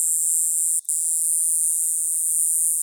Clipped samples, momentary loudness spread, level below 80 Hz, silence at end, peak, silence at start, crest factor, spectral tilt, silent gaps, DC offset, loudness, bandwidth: under 0.1%; 2 LU; under -90 dBFS; 0 s; -6 dBFS; 0 s; 14 dB; 11 dB/octave; none; under 0.1%; -18 LUFS; over 20 kHz